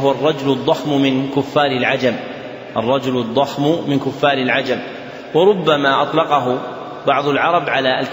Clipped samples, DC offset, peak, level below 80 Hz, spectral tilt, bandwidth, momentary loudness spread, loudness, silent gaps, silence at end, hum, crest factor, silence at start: under 0.1%; under 0.1%; -2 dBFS; -58 dBFS; -6 dB/octave; 16 kHz; 9 LU; -17 LUFS; none; 0 s; none; 16 dB; 0 s